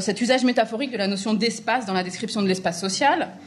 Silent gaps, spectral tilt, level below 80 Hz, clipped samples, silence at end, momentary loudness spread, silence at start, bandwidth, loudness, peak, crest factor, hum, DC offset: none; -4 dB/octave; -68 dBFS; under 0.1%; 0 s; 5 LU; 0 s; 12.5 kHz; -23 LUFS; -6 dBFS; 16 dB; none; under 0.1%